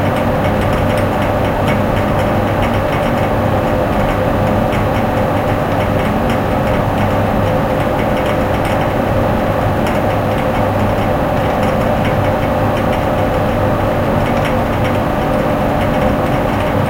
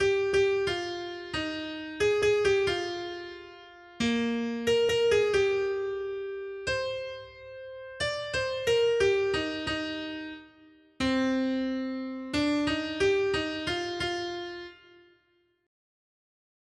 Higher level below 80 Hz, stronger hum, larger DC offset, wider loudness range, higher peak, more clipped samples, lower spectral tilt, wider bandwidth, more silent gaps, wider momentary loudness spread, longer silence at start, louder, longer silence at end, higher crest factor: first, -26 dBFS vs -56 dBFS; neither; neither; second, 0 LU vs 4 LU; first, -2 dBFS vs -14 dBFS; neither; first, -7 dB/octave vs -4 dB/octave; first, 16.5 kHz vs 12.5 kHz; neither; second, 1 LU vs 16 LU; about the same, 0 s vs 0 s; first, -15 LUFS vs -29 LUFS; second, 0 s vs 1.9 s; about the same, 12 dB vs 16 dB